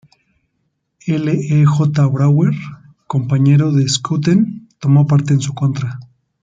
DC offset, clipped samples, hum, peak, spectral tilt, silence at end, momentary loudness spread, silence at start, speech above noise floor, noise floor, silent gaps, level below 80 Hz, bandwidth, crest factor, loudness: under 0.1%; under 0.1%; none; -2 dBFS; -6.5 dB/octave; 0.4 s; 11 LU; 1.05 s; 55 dB; -69 dBFS; none; -54 dBFS; 7.8 kHz; 12 dB; -15 LUFS